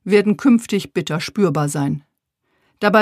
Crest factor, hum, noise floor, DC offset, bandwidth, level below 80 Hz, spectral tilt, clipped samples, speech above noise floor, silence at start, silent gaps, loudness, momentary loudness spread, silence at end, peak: 18 dB; none; -70 dBFS; under 0.1%; 15 kHz; -60 dBFS; -6 dB/octave; under 0.1%; 53 dB; 0.05 s; none; -18 LUFS; 8 LU; 0 s; 0 dBFS